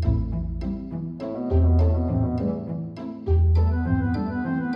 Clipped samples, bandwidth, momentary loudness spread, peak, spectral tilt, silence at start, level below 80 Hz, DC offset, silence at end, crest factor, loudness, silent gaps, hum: under 0.1%; 5.4 kHz; 12 LU; -8 dBFS; -11 dB/octave; 0 s; -28 dBFS; under 0.1%; 0 s; 14 dB; -24 LUFS; none; none